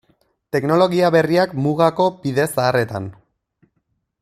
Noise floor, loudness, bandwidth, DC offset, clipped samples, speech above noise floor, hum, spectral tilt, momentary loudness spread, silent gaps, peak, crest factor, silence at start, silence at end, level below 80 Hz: -70 dBFS; -18 LUFS; 14.5 kHz; under 0.1%; under 0.1%; 53 dB; none; -6 dB/octave; 10 LU; none; -2 dBFS; 18 dB; 0.55 s; 1.1 s; -58 dBFS